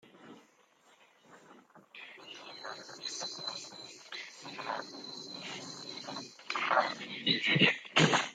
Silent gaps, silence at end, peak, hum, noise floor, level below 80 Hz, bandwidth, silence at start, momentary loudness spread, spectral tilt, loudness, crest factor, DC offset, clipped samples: none; 0 s; -10 dBFS; none; -66 dBFS; -78 dBFS; 9.6 kHz; 0.05 s; 21 LU; -3.5 dB/octave; -33 LUFS; 26 dB; under 0.1%; under 0.1%